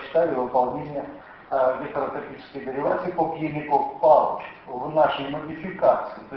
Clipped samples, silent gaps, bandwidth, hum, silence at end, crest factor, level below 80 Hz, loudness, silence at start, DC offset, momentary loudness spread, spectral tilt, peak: under 0.1%; none; 5.6 kHz; none; 0 s; 20 dB; -58 dBFS; -24 LUFS; 0 s; under 0.1%; 15 LU; -9 dB/octave; -4 dBFS